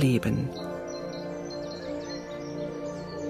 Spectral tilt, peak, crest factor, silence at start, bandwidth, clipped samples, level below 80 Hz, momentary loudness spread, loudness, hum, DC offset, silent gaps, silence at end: -6.5 dB/octave; -12 dBFS; 18 dB; 0 s; 15.5 kHz; under 0.1%; -54 dBFS; 8 LU; -33 LUFS; none; under 0.1%; none; 0 s